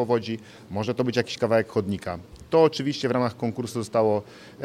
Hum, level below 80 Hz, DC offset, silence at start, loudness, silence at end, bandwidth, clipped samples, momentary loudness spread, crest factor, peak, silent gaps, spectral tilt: none; -58 dBFS; under 0.1%; 0 s; -25 LUFS; 0 s; 13.5 kHz; under 0.1%; 14 LU; 18 dB; -6 dBFS; none; -6 dB/octave